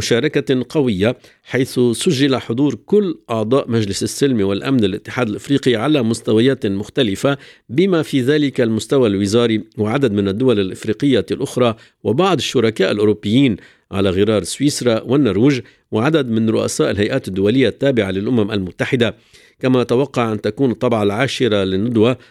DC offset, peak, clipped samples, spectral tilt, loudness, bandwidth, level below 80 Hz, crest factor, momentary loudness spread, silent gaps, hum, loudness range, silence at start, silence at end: under 0.1%; 0 dBFS; under 0.1%; -5.5 dB/octave; -17 LUFS; 14 kHz; -54 dBFS; 16 dB; 5 LU; none; none; 1 LU; 0 s; 0.15 s